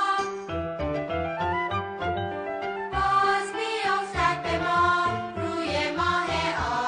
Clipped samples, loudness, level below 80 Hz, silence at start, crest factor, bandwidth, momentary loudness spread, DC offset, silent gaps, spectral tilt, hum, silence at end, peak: under 0.1%; -26 LUFS; -46 dBFS; 0 s; 14 dB; 10 kHz; 8 LU; under 0.1%; none; -4.5 dB/octave; none; 0 s; -12 dBFS